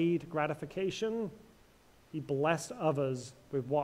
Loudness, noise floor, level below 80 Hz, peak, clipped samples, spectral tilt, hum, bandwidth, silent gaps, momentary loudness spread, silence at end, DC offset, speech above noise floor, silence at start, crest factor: -35 LUFS; -63 dBFS; -68 dBFS; -16 dBFS; under 0.1%; -6 dB/octave; none; 15 kHz; none; 10 LU; 0 s; under 0.1%; 29 dB; 0 s; 20 dB